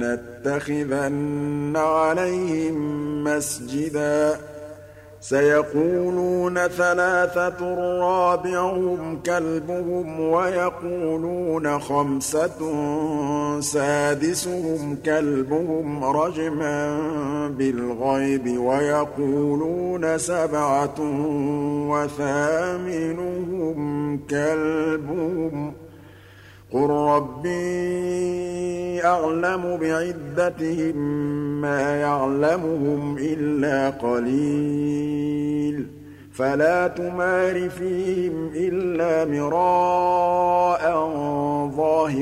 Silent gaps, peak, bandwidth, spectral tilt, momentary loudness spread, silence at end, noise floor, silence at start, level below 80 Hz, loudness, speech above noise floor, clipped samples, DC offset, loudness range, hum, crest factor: none; -6 dBFS; 15.5 kHz; -6 dB/octave; 7 LU; 0 s; -46 dBFS; 0 s; -54 dBFS; -23 LUFS; 24 dB; under 0.1%; under 0.1%; 3 LU; none; 16 dB